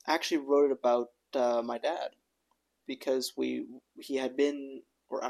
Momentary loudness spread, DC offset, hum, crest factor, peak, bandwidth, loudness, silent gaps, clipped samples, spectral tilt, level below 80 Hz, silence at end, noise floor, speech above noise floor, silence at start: 18 LU; under 0.1%; none; 20 dB; -12 dBFS; 13.5 kHz; -31 LUFS; none; under 0.1%; -3 dB/octave; -86 dBFS; 0 s; -78 dBFS; 47 dB; 0.05 s